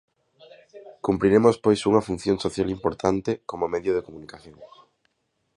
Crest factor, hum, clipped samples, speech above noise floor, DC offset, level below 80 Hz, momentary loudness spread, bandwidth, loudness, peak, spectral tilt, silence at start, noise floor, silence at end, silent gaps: 22 dB; none; under 0.1%; 51 dB; under 0.1%; -52 dBFS; 12 LU; 11 kHz; -23 LUFS; -4 dBFS; -6.5 dB/octave; 0.75 s; -74 dBFS; 0.9 s; none